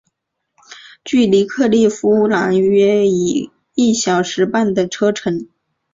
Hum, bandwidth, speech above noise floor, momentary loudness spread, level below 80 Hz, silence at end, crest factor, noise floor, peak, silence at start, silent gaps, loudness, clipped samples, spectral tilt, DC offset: none; 7.8 kHz; 59 dB; 9 LU; -56 dBFS; 0.5 s; 14 dB; -74 dBFS; -2 dBFS; 0.7 s; none; -15 LUFS; under 0.1%; -5 dB/octave; under 0.1%